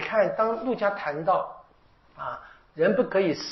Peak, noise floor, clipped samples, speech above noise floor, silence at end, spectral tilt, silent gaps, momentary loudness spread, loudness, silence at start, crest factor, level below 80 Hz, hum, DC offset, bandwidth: -10 dBFS; -59 dBFS; under 0.1%; 33 dB; 0 s; -4 dB/octave; none; 14 LU; -26 LUFS; 0 s; 18 dB; -62 dBFS; none; under 0.1%; 6 kHz